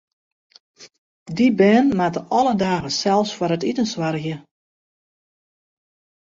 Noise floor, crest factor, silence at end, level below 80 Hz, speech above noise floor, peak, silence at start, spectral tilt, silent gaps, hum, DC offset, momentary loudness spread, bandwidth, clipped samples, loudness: under -90 dBFS; 18 dB; 1.8 s; -58 dBFS; over 71 dB; -4 dBFS; 0.8 s; -5.5 dB/octave; 0.98-1.26 s; none; under 0.1%; 12 LU; 7.8 kHz; under 0.1%; -19 LUFS